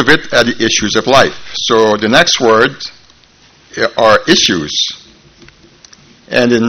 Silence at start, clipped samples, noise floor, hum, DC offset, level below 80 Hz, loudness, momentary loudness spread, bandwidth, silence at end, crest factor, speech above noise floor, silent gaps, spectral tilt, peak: 0 s; 0.7%; -46 dBFS; none; under 0.1%; -42 dBFS; -10 LUFS; 9 LU; 17.5 kHz; 0 s; 12 dB; 35 dB; none; -3 dB/octave; 0 dBFS